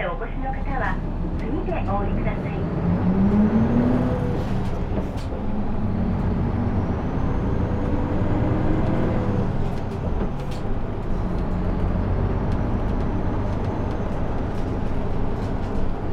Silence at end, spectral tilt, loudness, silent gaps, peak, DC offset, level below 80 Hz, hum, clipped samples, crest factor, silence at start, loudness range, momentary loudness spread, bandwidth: 0 s; -9 dB/octave; -25 LUFS; none; -6 dBFS; under 0.1%; -26 dBFS; none; under 0.1%; 16 dB; 0 s; 4 LU; 8 LU; 6.8 kHz